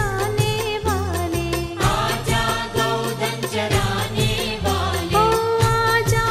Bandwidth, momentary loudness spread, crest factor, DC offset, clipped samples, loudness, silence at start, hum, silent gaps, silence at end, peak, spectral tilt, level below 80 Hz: 16 kHz; 6 LU; 16 dB; under 0.1%; under 0.1%; -20 LUFS; 0 s; none; none; 0 s; -4 dBFS; -4.5 dB/octave; -34 dBFS